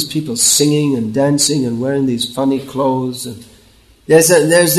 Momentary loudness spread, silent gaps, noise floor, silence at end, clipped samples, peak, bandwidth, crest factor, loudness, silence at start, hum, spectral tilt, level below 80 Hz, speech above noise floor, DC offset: 9 LU; none; -47 dBFS; 0 s; under 0.1%; 0 dBFS; 13.5 kHz; 14 dB; -13 LUFS; 0 s; none; -3.5 dB/octave; -52 dBFS; 34 dB; under 0.1%